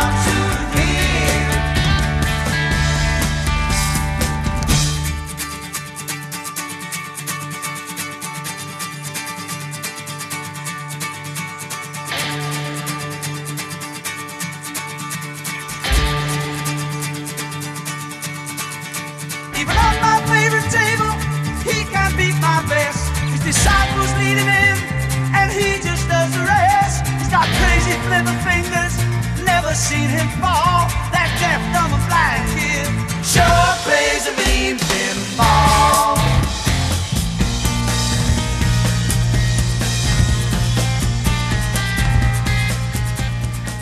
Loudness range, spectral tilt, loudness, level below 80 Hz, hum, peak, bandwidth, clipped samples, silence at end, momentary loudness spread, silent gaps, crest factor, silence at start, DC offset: 10 LU; -4 dB/octave; -18 LUFS; -26 dBFS; none; 0 dBFS; 14 kHz; under 0.1%; 0 s; 12 LU; none; 18 dB; 0 s; under 0.1%